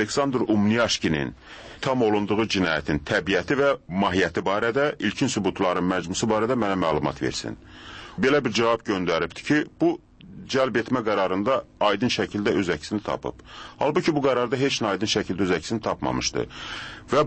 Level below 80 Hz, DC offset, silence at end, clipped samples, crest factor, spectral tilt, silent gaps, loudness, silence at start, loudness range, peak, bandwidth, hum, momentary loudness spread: -50 dBFS; under 0.1%; 0 s; under 0.1%; 16 dB; -4.5 dB/octave; none; -24 LUFS; 0 s; 1 LU; -8 dBFS; 8.8 kHz; none; 10 LU